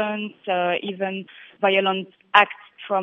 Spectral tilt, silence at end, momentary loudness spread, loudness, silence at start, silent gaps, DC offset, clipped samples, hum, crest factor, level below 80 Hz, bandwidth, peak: -6 dB/octave; 0 s; 14 LU; -22 LUFS; 0 s; none; under 0.1%; under 0.1%; none; 22 dB; -76 dBFS; 7.4 kHz; 0 dBFS